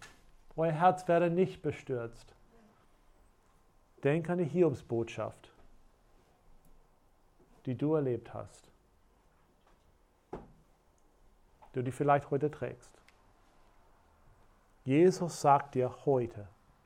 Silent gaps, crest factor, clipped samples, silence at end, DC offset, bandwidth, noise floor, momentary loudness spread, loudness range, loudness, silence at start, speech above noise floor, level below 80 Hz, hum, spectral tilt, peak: none; 22 dB; under 0.1%; 0.4 s; under 0.1%; 13.5 kHz; -67 dBFS; 19 LU; 7 LU; -32 LUFS; 0 s; 36 dB; -64 dBFS; none; -7 dB/octave; -12 dBFS